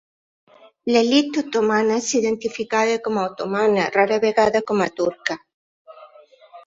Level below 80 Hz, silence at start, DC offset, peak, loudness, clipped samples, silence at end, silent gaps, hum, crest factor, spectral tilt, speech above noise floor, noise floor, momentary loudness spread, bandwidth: -62 dBFS; 0.85 s; under 0.1%; -2 dBFS; -20 LUFS; under 0.1%; 0.05 s; 5.54-5.85 s; none; 18 dB; -4 dB/octave; 29 dB; -49 dBFS; 7 LU; 7.8 kHz